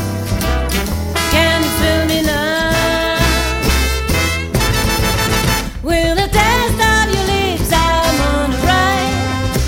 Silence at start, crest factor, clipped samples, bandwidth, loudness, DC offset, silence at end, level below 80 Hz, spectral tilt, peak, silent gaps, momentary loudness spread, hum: 0 s; 14 dB; under 0.1%; 17 kHz; -14 LUFS; under 0.1%; 0 s; -22 dBFS; -4 dB/octave; 0 dBFS; none; 5 LU; none